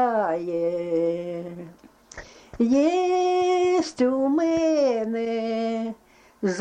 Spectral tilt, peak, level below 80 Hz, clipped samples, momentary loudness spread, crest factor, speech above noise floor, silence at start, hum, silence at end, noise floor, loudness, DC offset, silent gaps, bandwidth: -5.5 dB/octave; -12 dBFS; -58 dBFS; under 0.1%; 18 LU; 12 dB; 22 dB; 0 s; none; 0 s; -44 dBFS; -23 LUFS; under 0.1%; none; 9.4 kHz